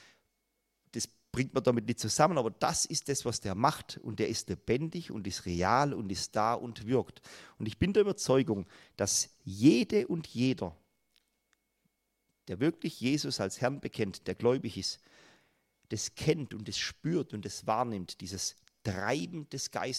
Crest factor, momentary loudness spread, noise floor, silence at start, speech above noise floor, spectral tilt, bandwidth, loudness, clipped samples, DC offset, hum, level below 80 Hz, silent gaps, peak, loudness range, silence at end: 22 dB; 12 LU; -80 dBFS; 0.95 s; 49 dB; -4.5 dB/octave; 15 kHz; -32 LUFS; under 0.1%; under 0.1%; none; -62 dBFS; none; -10 dBFS; 6 LU; 0 s